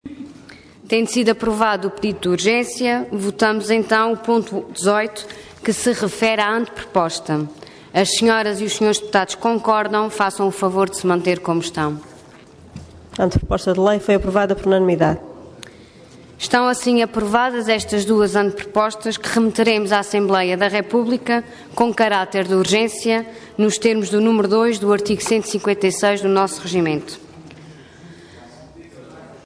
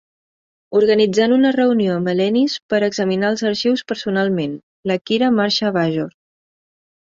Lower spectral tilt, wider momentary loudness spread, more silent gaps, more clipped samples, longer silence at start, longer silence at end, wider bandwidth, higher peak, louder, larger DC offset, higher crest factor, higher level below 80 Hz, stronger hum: about the same, -4.5 dB/octave vs -5.5 dB/octave; about the same, 8 LU vs 8 LU; second, none vs 2.62-2.69 s, 4.63-4.83 s; neither; second, 0.05 s vs 0.7 s; second, 0.1 s vs 0.95 s; first, 11 kHz vs 7.8 kHz; about the same, -2 dBFS vs -4 dBFS; about the same, -18 LUFS vs -18 LUFS; neither; about the same, 16 dB vs 14 dB; first, -44 dBFS vs -62 dBFS; neither